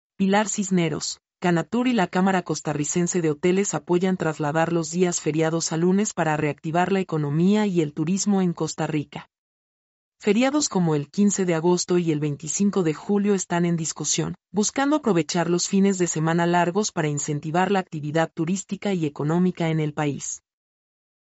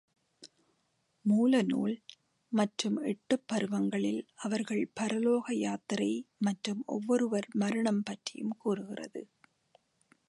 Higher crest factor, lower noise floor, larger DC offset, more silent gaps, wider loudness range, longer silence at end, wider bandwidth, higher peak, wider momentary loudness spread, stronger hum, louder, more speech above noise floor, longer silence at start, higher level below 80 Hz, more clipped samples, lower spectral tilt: about the same, 14 dB vs 18 dB; first, under -90 dBFS vs -76 dBFS; neither; first, 9.38-10.12 s vs none; about the same, 2 LU vs 2 LU; second, 0.9 s vs 1.05 s; second, 8.2 kHz vs 11.5 kHz; first, -8 dBFS vs -16 dBFS; second, 6 LU vs 9 LU; neither; first, -23 LUFS vs -32 LUFS; first, over 68 dB vs 45 dB; second, 0.2 s vs 0.4 s; first, -64 dBFS vs -80 dBFS; neither; about the same, -5 dB/octave vs -5.5 dB/octave